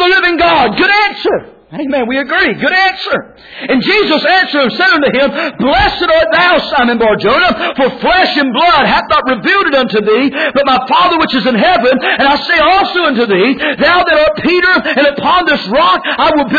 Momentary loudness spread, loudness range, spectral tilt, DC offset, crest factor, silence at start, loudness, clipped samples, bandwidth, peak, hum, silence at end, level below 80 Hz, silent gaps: 5 LU; 2 LU; -5.5 dB/octave; under 0.1%; 10 dB; 0 s; -9 LUFS; under 0.1%; 5 kHz; 0 dBFS; none; 0 s; -36 dBFS; none